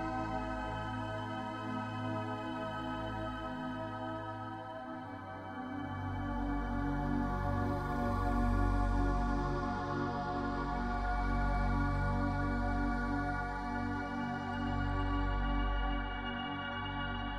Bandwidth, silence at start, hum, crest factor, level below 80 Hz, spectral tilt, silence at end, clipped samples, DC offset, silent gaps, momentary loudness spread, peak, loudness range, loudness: 9 kHz; 0 s; none; 16 dB; -40 dBFS; -7.5 dB/octave; 0 s; under 0.1%; under 0.1%; none; 7 LU; -20 dBFS; 6 LU; -37 LUFS